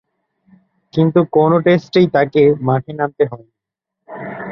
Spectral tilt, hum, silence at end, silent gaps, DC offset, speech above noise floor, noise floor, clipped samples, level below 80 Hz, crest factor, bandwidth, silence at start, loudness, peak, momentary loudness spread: -9 dB/octave; none; 0 s; none; under 0.1%; 68 dB; -82 dBFS; under 0.1%; -56 dBFS; 14 dB; 6.6 kHz; 0.95 s; -15 LUFS; -2 dBFS; 17 LU